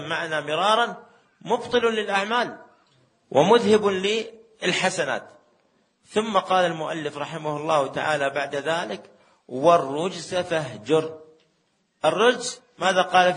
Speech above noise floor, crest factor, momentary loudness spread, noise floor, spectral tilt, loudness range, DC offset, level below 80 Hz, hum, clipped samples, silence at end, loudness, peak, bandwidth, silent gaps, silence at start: 46 dB; 20 dB; 11 LU; -69 dBFS; -4 dB/octave; 3 LU; under 0.1%; -68 dBFS; none; under 0.1%; 0 s; -23 LUFS; -2 dBFS; 10 kHz; none; 0 s